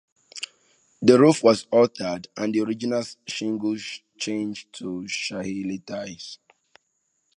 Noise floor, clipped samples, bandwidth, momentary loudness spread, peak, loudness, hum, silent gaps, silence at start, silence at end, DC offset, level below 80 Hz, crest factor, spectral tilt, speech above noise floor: -73 dBFS; under 0.1%; 11 kHz; 19 LU; -2 dBFS; -23 LUFS; none; none; 0.35 s; 1 s; under 0.1%; -66 dBFS; 22 dB; -5 dB/octave; 50 dB